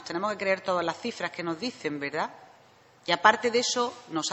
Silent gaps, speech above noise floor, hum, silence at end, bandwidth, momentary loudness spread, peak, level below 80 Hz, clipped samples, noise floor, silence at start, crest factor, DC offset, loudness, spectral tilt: none; 30 dB; none; 0 s; 8.4 kHz; 11 LU; -4 dBFS; -70 dBFS; under 0.1%; -58 dBFS; 0 s; 24 dB; under 0.1%; -28 LUFS; -2.5 dB/octave